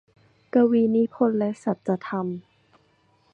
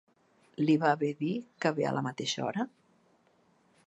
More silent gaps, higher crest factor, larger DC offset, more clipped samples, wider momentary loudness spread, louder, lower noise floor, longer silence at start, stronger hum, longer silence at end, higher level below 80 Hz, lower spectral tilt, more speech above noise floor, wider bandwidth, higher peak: neither; about the same, 18 dB vs 20 dB; neither; neither; about the same, 10 LU vs 10 LU; first, -23 LUFS vs -31 LUFS; second, -63 dBFS vs -68 dBFS; about the same, 0.55 s vs 0.6 s; neither; second, 0.95 s vs 1.2 s; first, -72 dBFS vs -82 dBFS; first, -9 dB/octave vs -5.5 dB/octave; about the same, 41 dB vs 38 dB; about the same, 8.2 kHz vs 8.4 kHz; first, -8 dBFS vs -12 dBFS